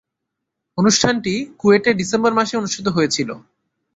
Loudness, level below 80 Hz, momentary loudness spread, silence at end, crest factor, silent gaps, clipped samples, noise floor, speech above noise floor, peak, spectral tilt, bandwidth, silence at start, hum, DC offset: -17 LUFS; -56 dBFS; 9 LU; 0.55 s; 18 dB; none; under 0.1%; -79 dBFS; 62 dB; -2 dBFS; -4 dB/octave; 8.2 kHz; 0.75 s; none; under 0.1%